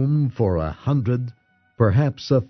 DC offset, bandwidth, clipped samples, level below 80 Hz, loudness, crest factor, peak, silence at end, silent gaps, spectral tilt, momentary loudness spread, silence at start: under 0.1%; 6.4 kHz; under 0.1%; -42 dBFS; -21 LUFS; 16 dB; -4 dBFS; 0.05 s; none; -9 dB/octave; 6 LU; 0 s